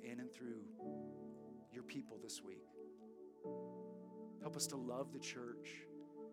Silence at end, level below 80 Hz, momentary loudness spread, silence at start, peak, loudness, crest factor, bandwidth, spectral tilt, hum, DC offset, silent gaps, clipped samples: 0 s; under -90 dBFS; 13 LU; 0 s; -26 dBFS; -51 LUFS; 24 dB; 17 kHz; -3.5 dB/octave; none; under 0.1%; none; under 0.1%